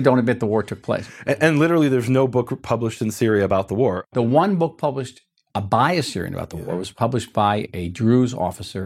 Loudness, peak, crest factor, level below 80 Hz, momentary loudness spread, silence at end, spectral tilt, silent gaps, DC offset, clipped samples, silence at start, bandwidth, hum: -21 LUFS; -2 dBFS; 18 dB; -52 dBFS; 11 LU; 0 s; -6.5 dB/octave; none; under 0.1%; under 0.1%; 0 s; 15.5 kHz; none